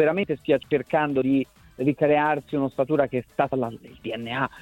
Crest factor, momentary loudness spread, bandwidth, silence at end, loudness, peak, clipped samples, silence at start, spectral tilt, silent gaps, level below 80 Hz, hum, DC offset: 18 dB; 11 LU; 15.5 kHz; 0 s; -24 LUFS; -6 dBFS; under 0.1%; 0 s; -8 dB/octave; none; -58 dBFS; none; under 0.1%